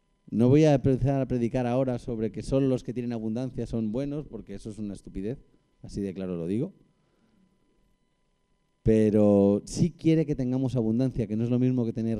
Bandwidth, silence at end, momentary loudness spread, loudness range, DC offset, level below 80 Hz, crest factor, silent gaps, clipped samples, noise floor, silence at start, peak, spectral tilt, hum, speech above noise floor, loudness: 11 kHz; 0 s; 16 LU; 11 LU; under 0.1%; -48 dBFS; 18 dB; none; under 0.1%; -71 dBFS; 0.3 s; -10 dBFS; -8.5 dB/octave; none; 45 dB; -27 LUFS